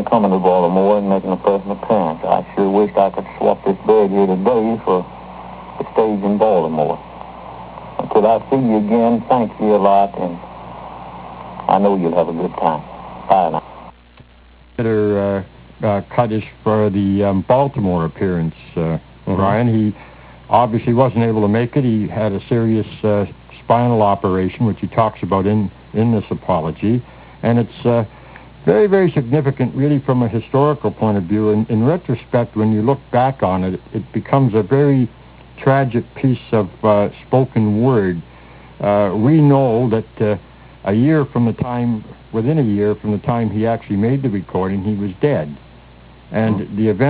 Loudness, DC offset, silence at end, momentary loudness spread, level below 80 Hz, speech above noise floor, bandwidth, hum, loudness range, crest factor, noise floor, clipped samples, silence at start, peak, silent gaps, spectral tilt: -17 LUFS; under 0.1%; 0 s; 11 LU; -42 dBFS; 30 dB; 4 kHz; none; 3 LU; 16 dB; -45 dBFS; under 0.1%; 0 s; 0 dBFS; none; -12.5 dB/octave